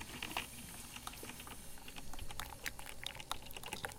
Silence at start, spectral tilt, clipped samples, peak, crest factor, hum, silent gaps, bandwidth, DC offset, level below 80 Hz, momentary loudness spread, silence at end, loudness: 0 s; -2 dB/octave; under 0.1%; -20 dBFS; 26 dB; none; none; 17 kHz; under 0.1%; -56 dBFS; 8 LU; 0 s; -46 LUFS